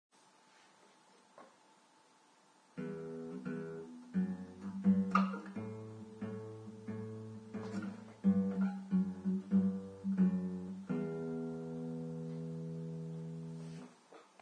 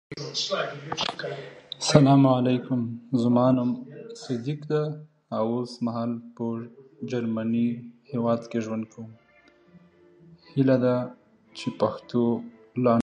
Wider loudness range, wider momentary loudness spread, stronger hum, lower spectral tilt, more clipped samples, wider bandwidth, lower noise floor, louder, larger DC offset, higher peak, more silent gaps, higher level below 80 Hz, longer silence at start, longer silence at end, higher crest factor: first, 12 LU vs 8 LU; about the same, 15 LU vs 17 LU; neither; first, -9 dB/octave vs -6.5 dB/octave; neither; about the same, 9 kHz vs 9.4 kHz; first, -67 dBFS vs -58 dBFS; second, -39 LUFS vs -26 LUFS; neither; second, -16 dBFS vs -2 dBFS; neither; second, -76 dBFS vs -64 dBFS; first, 1.4 s vs 0.1 s; first, 0.2 s vs 0 s; about the same, 22 dB vs 24 dB